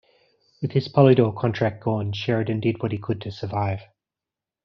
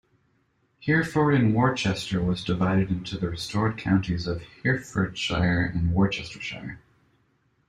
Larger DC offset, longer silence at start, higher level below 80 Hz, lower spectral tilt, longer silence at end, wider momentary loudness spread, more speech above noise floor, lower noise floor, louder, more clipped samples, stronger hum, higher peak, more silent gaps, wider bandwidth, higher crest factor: neither; second, 0.6 s vs 0.8 s; second, -58 dBFS vs -46 dBFS; about the same, -6.5 dB/octave vs -6.5 dB/octave; about the same, 0.8 s vs 0.9 s; first, 13 LU vs 10 LU; first, 67 dB vs 44 dB; first, -89 dBFS vs -68 dBFS; about the same, -23 LUFS vs -25 LUFS; neither; neither; about the same, -4 dBFS vs -6 dBFS; neither; second, 6.4 kHz vs 11.5 kHz; about the same, 20 dB vs 18 dB